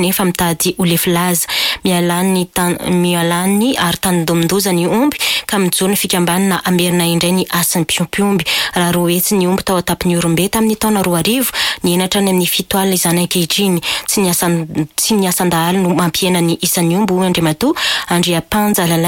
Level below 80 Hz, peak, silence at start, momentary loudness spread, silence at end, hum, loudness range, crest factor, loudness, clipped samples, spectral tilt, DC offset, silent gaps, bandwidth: -42 dBFS; -2 dBFS; 0 s; 2 LU; 0 s; none; 0 LU; 12 dB; -14 LUFS; under 0.1%; -4 dB/octave; under 0.1%; none; 17 kHz